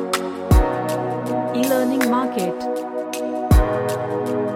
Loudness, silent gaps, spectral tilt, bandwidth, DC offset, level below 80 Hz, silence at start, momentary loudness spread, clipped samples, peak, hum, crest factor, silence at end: -21 LUFS; none; -6 dB/octave; 16.5 kHz; under 0.1%; -26 dBFS; 0 s; 8 LU; under 0.1%; -4 dBFS; none; 16 dB; 0 s